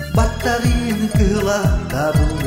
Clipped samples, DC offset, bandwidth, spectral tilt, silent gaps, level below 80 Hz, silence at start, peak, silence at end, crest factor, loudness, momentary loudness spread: under 0.1%; 0.1%; 16.5 kHz; -6 dB/octave; none; -22 dBFS; 0 s; -2 dBFS; 0 s; 14 dB; -18 LUFS; 2 LU